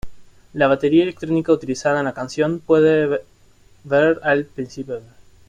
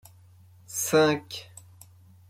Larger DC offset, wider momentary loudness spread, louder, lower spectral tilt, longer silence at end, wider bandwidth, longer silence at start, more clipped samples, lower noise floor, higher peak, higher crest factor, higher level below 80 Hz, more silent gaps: neither; second, 15 LU vs 18 LU; first, -18 LUFS vs -25 LUFS; first, -6.5 dB/octave vs -3.5 dB/octave; second, 0.5 s vs 0.85 s; second, 9.4 kHz vs 16.5 kHz; second, 0.05 s vs 0.7 s; neither; about the same, -51 dBFS vs -54 dBFS; first, -4 dBFS vs -10 dBFS; about the same, 16 dB vs 20 dB; first, -50 dBFS vs -70 dBFS; neither